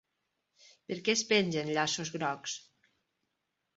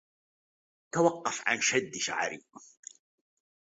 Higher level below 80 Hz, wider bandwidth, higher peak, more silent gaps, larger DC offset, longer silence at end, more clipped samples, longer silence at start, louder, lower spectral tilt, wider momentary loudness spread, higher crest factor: about the same, -76 dBFS vs -76 dBFS; about the same, 8 kHz vs 8 kHz; about the same, -12 dBFS vs -10 dBFS; neither; neither; about the same, 1.15 s vs 1.05 s; neither; about the same, 0.9 s vs 0.95 s; about the same, -31 LUFS vs -29 LUFS; about the same, -2.5 dB/octave vs -2.5 dB/octave; second, 13 LU vs 22 LU; about the same, 22 dB vs 22 dB